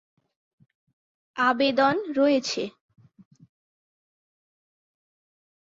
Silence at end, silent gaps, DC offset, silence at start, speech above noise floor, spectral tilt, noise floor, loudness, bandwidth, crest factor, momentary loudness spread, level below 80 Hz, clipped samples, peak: 3.05 s; none; under 0.1%; 1.35 s; over 67 dB; -3.5 dB/octave; under -90 dBFS; -23 LUFS; 7.8 kHz; 20 dB; 12 LU; -74 dBFS; under 0.1%; -8 dBFS